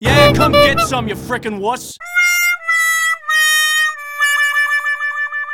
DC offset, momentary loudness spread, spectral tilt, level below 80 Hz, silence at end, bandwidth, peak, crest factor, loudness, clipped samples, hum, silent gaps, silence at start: under 0.1%; 10 LU; -3 dB/octave; -38 dBFS; 0 s; 18 kHz; 0 dBFS; 14 dB; -13 LUFS; under 0.1%; none; none; 0 s